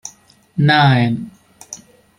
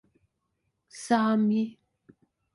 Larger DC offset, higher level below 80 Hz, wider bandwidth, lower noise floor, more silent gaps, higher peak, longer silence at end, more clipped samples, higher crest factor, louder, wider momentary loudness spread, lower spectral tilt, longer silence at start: neither; first, -54 dBFS vs -74 dBFS; about the same, 10.5 kHz vs 11.5 kHz; second, -47 dBFS vs -78 dBFS; neither; first, -2 dBFS vs -12 dBFS; second, 0.4 s vs 0.85 s; neither; about the same, 16 dB vs 18 dB; first, -14 LUFS vs -26 LUFS; first, 23 LU vs 13 LU; about the same, -5.5 dB/octave vs -6 dB/octave; second, 0.05 s vs 0.95 s